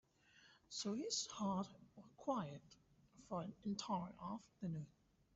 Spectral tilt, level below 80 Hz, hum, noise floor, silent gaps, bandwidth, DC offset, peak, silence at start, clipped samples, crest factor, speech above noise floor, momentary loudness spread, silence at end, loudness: -5.5 dB/octave; -78 dBFS; none; -71 dBFS; none; 8 kHz; under 0.1%; -28 dBFS; 0.35 s; under 0.1%; 20 dB; 25 dB; 11 LU; 0.45 s; -46 LUFS